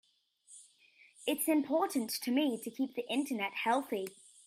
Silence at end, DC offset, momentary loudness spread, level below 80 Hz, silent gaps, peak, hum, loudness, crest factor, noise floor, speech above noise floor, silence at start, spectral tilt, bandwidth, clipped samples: 0.35 s; under 0.1%; 13 LU; -86 dBFS; none; -18 dBFS; none; -34 LUFS; 18 dB; -66 dBFS; 32 dB; 0.5 s; -3 dB/octave; 16 kHz; under 0.1%